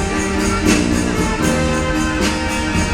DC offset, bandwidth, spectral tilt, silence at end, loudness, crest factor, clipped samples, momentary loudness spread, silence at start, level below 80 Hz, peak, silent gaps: under 0.1%; 17 kHz; -4.5 dB/octave; 0 s; -17 LUFS; 16 dB; under 0.1%; 3 LU; 0 s; -26 dBFS; 0 dBFS; none